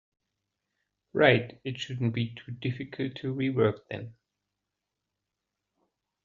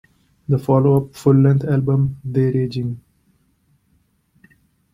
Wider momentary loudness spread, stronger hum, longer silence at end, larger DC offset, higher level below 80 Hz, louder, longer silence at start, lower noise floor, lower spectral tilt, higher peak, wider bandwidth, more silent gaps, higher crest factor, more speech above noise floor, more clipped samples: first, 16 LU vs 12 LU; first, 50 Hz at -65 dBFS vs none; first, 2.15 s vs 1.95 s; neither; second, -68 dBFS vs -50 dBFS; second, -29 LUFS vs -18 LUFS; first, 1.15 s vs 0.5 s; first, -86 dBFS vs -62 dBFS; second, -5 dB/octave vs -9.5 dB/octave; second, -8 dBFS vs -2 dBFS; second, 7.4 kHz vs 11.5 kHz; neither; first, 24 dB vs 18 dB; first, 57 dB vs 46 dB; neither